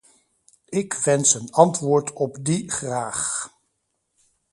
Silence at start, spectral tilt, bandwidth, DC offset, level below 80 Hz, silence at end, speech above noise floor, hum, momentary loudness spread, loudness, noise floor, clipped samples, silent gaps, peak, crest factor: 0.7 s; -4 dB/octave; 11.5 kHz; under 0.1%; -62 dBFS; 1.05 s; 53 dB; none; 10 LU; -21 LUFS; -74 dBFS; under 0.1%; none; 0 dBFS; 24 dB